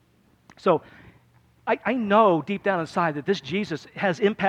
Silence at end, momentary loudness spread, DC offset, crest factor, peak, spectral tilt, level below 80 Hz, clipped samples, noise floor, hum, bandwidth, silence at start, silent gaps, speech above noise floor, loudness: 0 s; 9 LU; under 0.1%; 18 dB; -6 dBFS; -6.5 dB/octave; -64 dBFS; under 0.1%; -58 dBFS; none; 9.8 kHz; 0.65 s; none; 35 dB; -24 LUFS